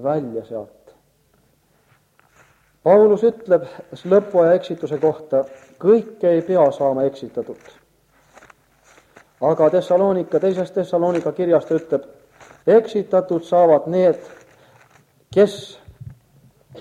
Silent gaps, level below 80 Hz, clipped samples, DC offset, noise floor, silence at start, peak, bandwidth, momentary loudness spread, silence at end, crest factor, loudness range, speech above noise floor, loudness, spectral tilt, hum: none; -62 dBFS; under 0.1%; under 0.1%; -60 dBFS; 0 s; -2 dBFS; 10.5 kHz; 15 LU; 0 s; 18 dB; 4 LU; 42 dB; -18 LUFS; -7.5 dB/octave; none